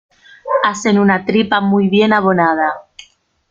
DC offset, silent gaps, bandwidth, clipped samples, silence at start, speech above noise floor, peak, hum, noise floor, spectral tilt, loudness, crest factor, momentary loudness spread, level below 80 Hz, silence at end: under 0.1%; none; 7.6 kHz; under 0.1%; 0.45 s; 35 dB; 0 dBFS; none; -48 dBFS; -5.5 dB/octave; -14 LUFS; 14 dB; 7 LU; -56 dBFS; 0.7 s